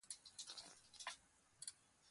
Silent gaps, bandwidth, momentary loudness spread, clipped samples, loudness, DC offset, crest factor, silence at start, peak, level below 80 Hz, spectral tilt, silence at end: none; 11.5 kHz; 5 LU; under 0.1%; -55 LUFS; under 0.1%; 24 dB; 0.05 s; -34 dBFS; -88 dBFS; 1 dB/octave; 0 s